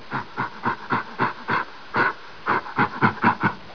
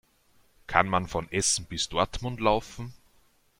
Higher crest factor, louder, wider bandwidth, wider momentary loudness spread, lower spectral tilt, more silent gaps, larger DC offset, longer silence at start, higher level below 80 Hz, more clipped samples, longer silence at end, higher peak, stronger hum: second, 20 dB vs 28 dB; first, -24 LUFS vs -27 LUFS; second, 5.4 kHz vs 16.5 kHz; second, 8 LU vs 13 LU; first, -7 dB/octave vs -3 dB/octave; neither; first, 0.8% vs under 0.1%; second, 0 s vs 0.7 s; second, -60 dBFS vs -48 dBFS; neither; second, 0 s vs 0.65 s; about the same, -4 dBFS vs -2 dBFS; neither